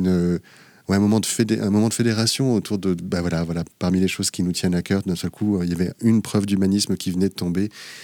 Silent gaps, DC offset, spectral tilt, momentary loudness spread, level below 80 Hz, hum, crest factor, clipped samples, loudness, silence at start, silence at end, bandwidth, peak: none; under 0.1%; -5.5 dB/octave; 6 LU; -50 dBFS; none; 14 dB; under 0.1%; -21 LUFS; 0 s; 0 s; 19 kHz; -6 dBFS